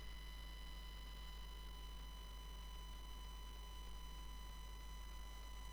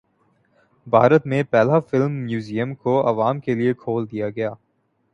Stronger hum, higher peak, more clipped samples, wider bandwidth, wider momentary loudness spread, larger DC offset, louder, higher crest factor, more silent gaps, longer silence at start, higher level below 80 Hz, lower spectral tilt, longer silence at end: neither; second, -40 dBFS vs -2 dBFS; neither; first, over 20 kHz vs 8.6 kHz; second, 1 LU vs 10 LU; neither; second, -55 LUFS vs -20 LUFS; second, 12 dB vs 20 dB; neither; second, 0 s vs 0.85 s; first, -52 dBFS vs -62 dBFS; second, -3.5 dB/octave vs -8.5 dB/octave; second, 0 s vs 0.6 s